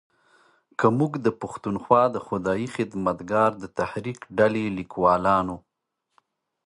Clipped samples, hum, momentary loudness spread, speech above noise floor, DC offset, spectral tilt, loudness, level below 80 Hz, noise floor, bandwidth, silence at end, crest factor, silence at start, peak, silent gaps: under 0.1%; none; 11 LU; 56 dB; under 0.1%; -7 dB/octave; -24 LUFS; -56 dBFS; -79 dBFS; 11 kHz; 1.05 s; 22 dB; 0.8 s; -4 dBFS; none